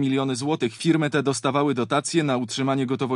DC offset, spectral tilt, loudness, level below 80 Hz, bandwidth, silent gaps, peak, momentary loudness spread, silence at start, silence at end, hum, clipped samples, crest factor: under 0.1%; -5 dB/octave; -23 LUFS; -68 dBFS; 12 kHz; none; -6 dBFS; 3 LU; 0 s; 0 s; none; under 0.1%; 16 dB